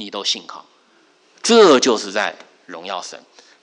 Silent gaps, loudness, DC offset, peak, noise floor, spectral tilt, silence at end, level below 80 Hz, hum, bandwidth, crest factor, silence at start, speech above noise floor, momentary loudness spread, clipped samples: none; -16 LUFS; under 0.1%; -2 dBFS; -55 dBFS; -2.5 dB/octave; 0.45 s; -70 dBFS; none; 11 kHz; 18 dB; 0 s; 38 dB; 24 LU; under 0.1%